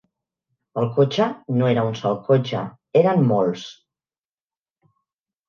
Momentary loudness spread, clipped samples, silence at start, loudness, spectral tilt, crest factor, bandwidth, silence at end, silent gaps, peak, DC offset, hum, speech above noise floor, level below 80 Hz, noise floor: 11 LU; under 0.1%; 0.75 s; -20 LUFS; -7.5 dB/octave; 18 dB; 7.2 kHz; 1.75 s; none; -4 dBFS; under 0.1%; none; over 71 dB; -66 dBFS; under -90 dBFS